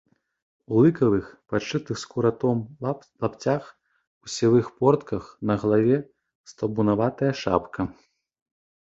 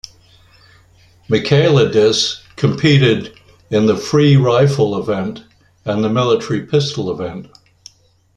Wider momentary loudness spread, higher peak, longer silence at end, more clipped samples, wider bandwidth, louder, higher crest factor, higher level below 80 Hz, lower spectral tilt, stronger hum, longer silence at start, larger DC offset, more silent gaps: about the same, 11 LU vs 13 LU; second, -4 dBFS vs 0 dBFS; about the same, 0.9 s vs 0.9 s; neither; second, 8 kHz vs 9.6 kHz; second, -24 LUFS vs -15 LUFS; about the same, 20 dB vs 16 dB; about the same, -54 dBFS vs -50 dBFS; about the same, -7 dB/octave vs -6 dB/octave; neither; second, 0.7 s vs 1.3 s; neither; first, 4.07-4.21 s, 6.35-6.44 s vs none